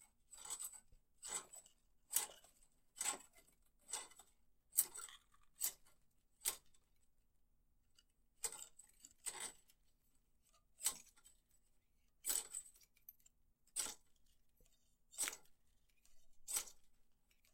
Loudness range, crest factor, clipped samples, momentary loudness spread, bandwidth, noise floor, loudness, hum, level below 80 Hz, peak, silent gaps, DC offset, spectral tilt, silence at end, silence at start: 6 LU; 34 dB; under 0.1%; 22 LU; 16 kHz; -76 dBFS; -45 LUFS; none; -76 dBFS; -18 dBFS; none; under 0.1%; 2 dB/octave; 0.4 s; 0 s